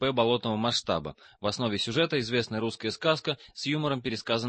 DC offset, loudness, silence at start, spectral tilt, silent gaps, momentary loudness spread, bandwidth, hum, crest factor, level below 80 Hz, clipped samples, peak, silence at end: under 0.1%; -29 LUFS; 0 s; -5 dB/octave; none; 7 LU; 8.8 kHz; none; 18 dB; -60 dBFS; under 0.1%; -10 dBFS; 0 s